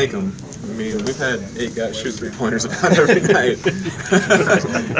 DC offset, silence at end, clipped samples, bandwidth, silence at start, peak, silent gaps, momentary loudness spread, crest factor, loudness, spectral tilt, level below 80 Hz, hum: under 0.1%; 0 s; under 0.1%; 8 kHz; 0 s; 0 dBFS; none; 12 LU; 18 dB; -18 LUFS; -4.5 dB/octave; -46 dBFS; none